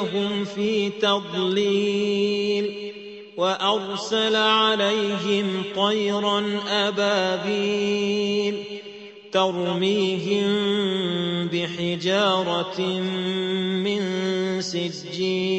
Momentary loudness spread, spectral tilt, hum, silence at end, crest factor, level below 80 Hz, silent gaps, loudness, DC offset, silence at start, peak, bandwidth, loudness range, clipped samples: 6 LU; -5 dB/octave; none; 0 s; 16 dB; -66 dBFS; none; -23 LUFS; under 0.1%; 0 s; -8 dBFS; 8.4 kHz; 2 LU; under 0.1%